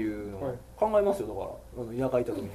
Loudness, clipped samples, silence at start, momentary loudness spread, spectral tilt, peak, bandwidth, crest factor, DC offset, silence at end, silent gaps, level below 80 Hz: -30 LUFS; under 0.1%; 0 s; 12 LU; -7.5 dB/octave; -12 dBFS; 14 kHz; 18 dB; under 0.1%; 0 s; none; -52 dBFS